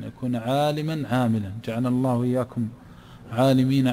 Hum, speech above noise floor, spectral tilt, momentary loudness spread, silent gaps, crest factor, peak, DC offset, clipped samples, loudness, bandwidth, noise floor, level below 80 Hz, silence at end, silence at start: none; 21 dB; -7.5 dB/octave; 10 LU; none; 14 dB; -8 dBFS; under 0.1%; under 0.1%; -24 LUFS; 15 kHz; -44 dBFS; -56 dBFS; 0 s; 0 s